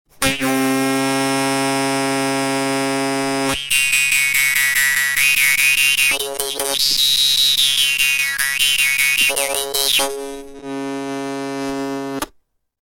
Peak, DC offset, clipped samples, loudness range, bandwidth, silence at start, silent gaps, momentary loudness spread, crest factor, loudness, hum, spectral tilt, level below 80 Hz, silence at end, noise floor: 0 dBFS; under 0.1%; under 0.1%; 5 LU; 18 kHz; 0.2 s; none; 13 LU; 18 dB; -15 LUFS; none; -1 dB/octave; -48 dBFS; 0.6 s; -59 dBFS